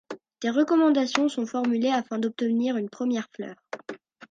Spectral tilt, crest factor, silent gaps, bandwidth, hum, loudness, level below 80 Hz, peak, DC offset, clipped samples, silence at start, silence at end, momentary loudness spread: -4.5 dB/octave; 20 dB; none; 9.2 kHz; none; -25 LUFS; -78 dBFS; -6 dBFS; under 0.1%; under 0.1%; 0.1 s; 0.35 s; 18 LU